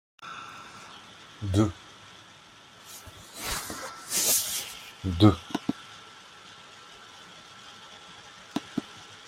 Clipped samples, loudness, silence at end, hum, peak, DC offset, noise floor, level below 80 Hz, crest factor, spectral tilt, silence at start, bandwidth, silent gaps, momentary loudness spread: under 0.1%; -28 LUFS; 0 s; none; -4 dBFS; under 0.1%; -52 dBFS; -56 dBFS; 28 dB; -4 dB/octave; 0.2 s; 16 kHz; none; 25 LU